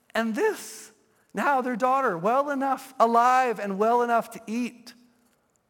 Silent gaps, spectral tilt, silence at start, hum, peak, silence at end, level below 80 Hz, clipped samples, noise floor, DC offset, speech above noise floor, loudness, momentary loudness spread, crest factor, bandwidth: none; -5 dB/octave; 0.15 s; none; -6 dBFS; 0.8 s; -82 dBFS; under 0.1%; -67 dBFS; under 0.1%; 43 dB; -24 LUFS; 14 LU; 18 dB; 17.5 kHz